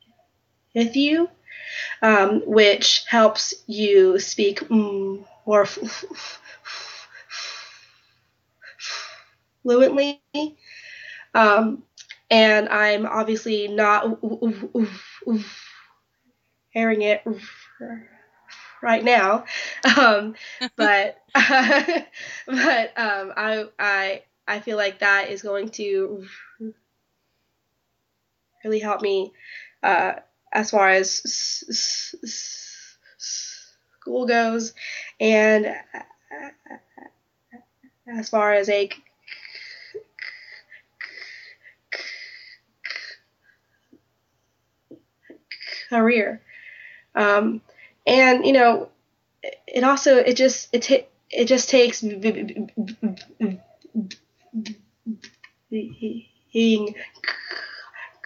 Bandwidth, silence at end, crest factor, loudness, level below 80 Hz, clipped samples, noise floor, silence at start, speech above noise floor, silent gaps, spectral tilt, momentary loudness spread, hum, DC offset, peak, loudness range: 7.6 kHz; 0.15 s; 22 dB; -20 LUFS; -74 dBFS; under 0.1%; -74 dBFS; 0.75 s; 54 dB; none; -3 dB/octave; 22 LU; none; under 0.1%; -2 dBFS; 15 LU